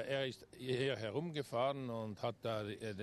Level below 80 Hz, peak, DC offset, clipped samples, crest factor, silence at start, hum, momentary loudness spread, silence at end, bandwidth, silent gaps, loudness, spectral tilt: -74 dBFS; -24 dBFS; under 0.1%; under 0.1%; 16 dB; 0 s; none; 6 LU; 0 s; 13.5 kHz; none; -41 LUFS; -6 dB/octave